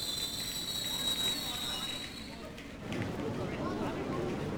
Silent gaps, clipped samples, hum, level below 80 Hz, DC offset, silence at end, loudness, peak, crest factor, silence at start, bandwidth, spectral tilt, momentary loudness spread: none; under 0.1%; none; -54 dBFS; under 0.1%; 0 s; -35 LUFS; -20 dBFS; 16 dB; 0 s; over 20 kHz; -3 dB/octave; 12 LU